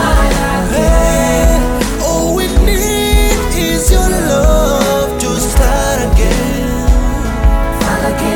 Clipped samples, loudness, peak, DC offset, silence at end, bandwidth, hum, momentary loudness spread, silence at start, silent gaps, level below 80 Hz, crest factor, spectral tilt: under 0.1%; -13 LUFS; 0 dBFS; under 0.1%; 0 s; 17.5 kHz; none; 4 LU; 0 s; none; -14 dBFS; 10 dB; -4.5 dB/octave